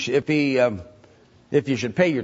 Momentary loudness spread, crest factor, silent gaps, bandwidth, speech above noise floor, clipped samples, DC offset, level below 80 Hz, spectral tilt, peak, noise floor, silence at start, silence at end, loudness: 5 LU; 18 dB; none; 8 kHz; 32 dB; under 0.1%; under 0.1%; -58 dBFS; -6 dB/octave; -4 dBFS; -53 dBFS; 0 s; 0 s; -22 LUFS